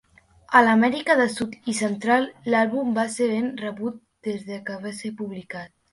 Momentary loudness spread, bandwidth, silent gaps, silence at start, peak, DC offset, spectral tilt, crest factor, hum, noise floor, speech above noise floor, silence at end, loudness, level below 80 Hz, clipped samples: 15 LU; 11.5 kHz; none; 0.5 s; -2 dBFS; under 0.1%; -4.5 dB/octave; 22 dB; none; -52 dBFS; 29 dB; 0.25 s; -23 LUFS; -64 dBFS; under 0.1%